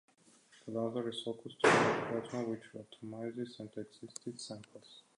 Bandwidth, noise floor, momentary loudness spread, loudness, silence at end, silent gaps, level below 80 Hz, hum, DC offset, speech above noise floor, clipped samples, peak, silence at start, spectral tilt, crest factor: 11 kHz; -65 dBFS; 21 LU; -36 LUFS; 0.2 s; none; -76 dBFS; none; under 0.1%; 28 dB; under 0.1%; -14 dBFS; 0.65 s; -4.5 dB/octave; 24 dB